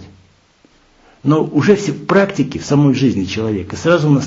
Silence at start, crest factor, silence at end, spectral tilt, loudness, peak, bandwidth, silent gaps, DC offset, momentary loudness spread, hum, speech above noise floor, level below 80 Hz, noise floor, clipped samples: 0 s; 16 dB; 0 s; -6.5 dB/octave; -15 LUFS; 0 dBFS; 7.8 kHz; none; under 0.1%; 7 LU; none; 38 dB; -50 dBFS; -52 dBFS; under 0.1%